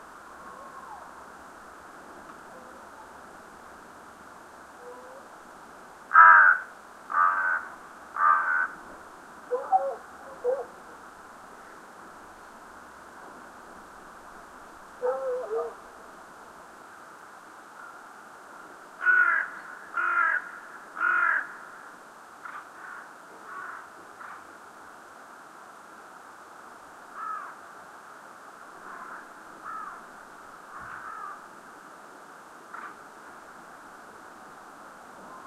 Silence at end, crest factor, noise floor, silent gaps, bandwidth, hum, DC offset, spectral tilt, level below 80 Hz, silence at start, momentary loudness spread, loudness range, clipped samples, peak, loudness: 0 s; 28 dB; -48 dBFS; none; 14.5 kHz; none; under 0.1%; -2.5 dB/octave; -72 dBFS; 0 s; 23 LU; 25 LU; under 0.1%; -4 dBFS; -24 LUFS